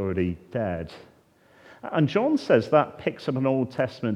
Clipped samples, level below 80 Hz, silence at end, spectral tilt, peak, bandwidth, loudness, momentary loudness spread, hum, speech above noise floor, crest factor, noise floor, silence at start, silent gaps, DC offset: under 0.1%; -60 dBFS; 0 s; -8 dB/octave; -6 dBFS; 10.5 kHz; -25 LUFS; 10 LU; none; 33 dB; 20 dB; -58 dBFS; 0 s; none; under 0.1%